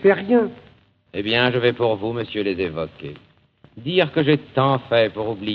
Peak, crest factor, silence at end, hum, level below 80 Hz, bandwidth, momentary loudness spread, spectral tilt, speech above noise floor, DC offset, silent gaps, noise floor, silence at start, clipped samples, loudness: -2 dBFS; 18 dB; 0 s; none; -56 dBFS; 5.4 kHz; 12 LU; -8.5 dB/octave; 34 dB; under 0.1%; none; -54 dBFS; 0 s; under 0.1%; -20 LUFS